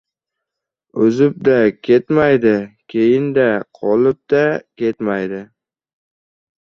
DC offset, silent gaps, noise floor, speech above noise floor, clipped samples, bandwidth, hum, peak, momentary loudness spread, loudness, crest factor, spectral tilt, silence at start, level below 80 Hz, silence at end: under 0.1%; none; -82 dBFS; 67 dB; under 0.1%; 6.8 kHz; none; -2 dBFS; 9 LU; -16 LUFS; 16 dB; -8 dB/octave; 0.95 s; -56 dBFS; 1.25 s